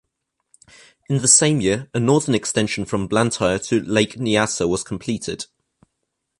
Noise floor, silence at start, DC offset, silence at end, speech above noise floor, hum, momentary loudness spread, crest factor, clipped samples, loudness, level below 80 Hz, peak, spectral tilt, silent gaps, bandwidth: -76 dBFS; 1.1 s; under 0.1%; 0.95 s; 57 dB; none; 13 LU; 20 dB; under 0.1%; -19 LUFS; -50 dBFS; 0 dBFS; -4 dB/octave; none; 11.5 kHz